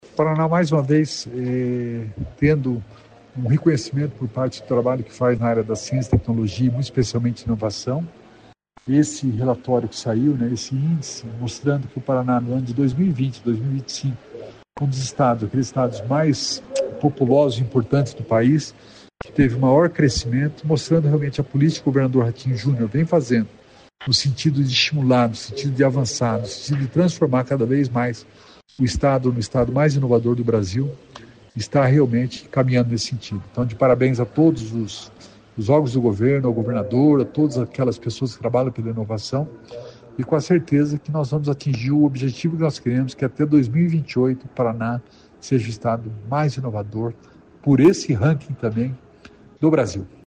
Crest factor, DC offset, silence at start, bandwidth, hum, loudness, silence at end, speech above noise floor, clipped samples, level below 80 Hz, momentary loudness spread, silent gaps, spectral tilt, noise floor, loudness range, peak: 16 dB; under 0.1%; 0.15 s; 9.6 kHz; none; -20 LUFS; 0.2 s; 30 dB; under 0.1%; -46 dBFS; 10 LU; none; -6.5 dB/octave; -50 dBFS; 3 LU; -4 dBFS